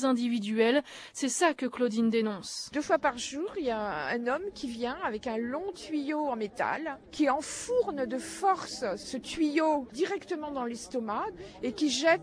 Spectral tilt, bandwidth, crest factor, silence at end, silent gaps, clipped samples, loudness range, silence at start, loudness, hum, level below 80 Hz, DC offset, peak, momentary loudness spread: -3.5 dB/octave; 11 kHz; 18 dB; 0 s; none; under 0.1%; 4 LU; 0 s; -31 LUFS; none; -64 dBFS; under 0.1%; -14 dBFS; 9 LU